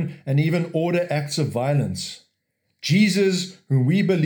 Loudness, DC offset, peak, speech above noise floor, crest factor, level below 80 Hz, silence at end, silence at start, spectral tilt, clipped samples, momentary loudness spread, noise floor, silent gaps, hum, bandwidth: -22 LUFS; under 0.1%; -8 dBFS; 53 dB; 14 dB; -66 dBFS; 0 s; 0 s; -6 dB/octave; under 0.1%; 11 LU; -74 dBFS; none; none; 19.5 kHz